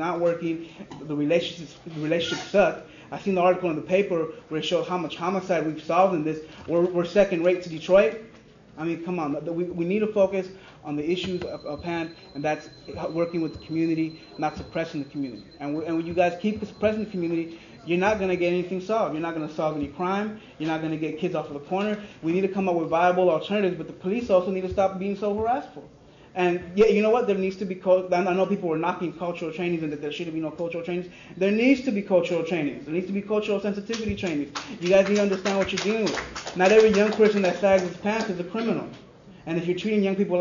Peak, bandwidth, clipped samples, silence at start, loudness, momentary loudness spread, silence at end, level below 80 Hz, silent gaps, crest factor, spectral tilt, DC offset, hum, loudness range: -6 dBFS; 7.4 kHz; under 0.1%; 0 s; -25 LUFS; 12 LU; 0 s; -56 dBFS; none; 20 dB; -6 dB/octave; under 0.1%; none; 6 LU